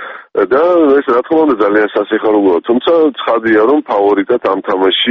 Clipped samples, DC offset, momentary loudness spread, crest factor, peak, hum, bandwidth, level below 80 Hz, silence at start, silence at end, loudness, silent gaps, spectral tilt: under 0.1%; under 0.1%; 4 LU; 10 dB; 0 dBFS; none; 5.6 kHz; -54 dBFS; 0 s; 0 s; -11 LUFS; none; -1.5 dB/octave